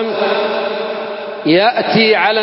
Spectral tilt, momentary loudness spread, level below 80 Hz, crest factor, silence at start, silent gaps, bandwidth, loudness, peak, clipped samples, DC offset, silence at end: -9 dB/octave; 11 LU; -60 dBFS; 14 dB; 0 s; none; 5.8 kHz; -14 LUFS; 0 dBFS; under 0.1%; under 0.1%; 0 s